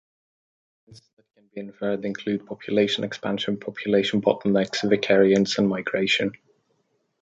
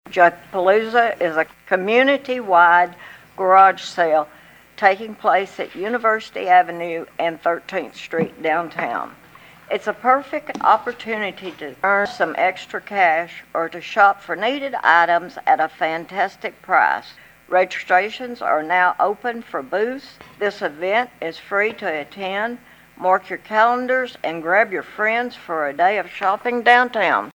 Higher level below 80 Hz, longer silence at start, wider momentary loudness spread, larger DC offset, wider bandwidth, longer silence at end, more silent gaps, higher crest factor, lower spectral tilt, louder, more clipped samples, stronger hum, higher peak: about the same, -64 dBFS vs -66 dBFS; first, 0.9 s vs 0.1 s; about the same, 11 LU vs 11 LU; neither; second, 8 kHz vs 19.5 kHz; first, 0.9 s vs 0.05 s; first, 1.13-1.17 s vs none; about the same, 20 dB vs 20 dB; about the same, -5 dB/octave vs -4.5 dB/octave; second, -23 LUFS vs -19 LUFS; neither; neither; second, -4 dBFS vs 0 dBFS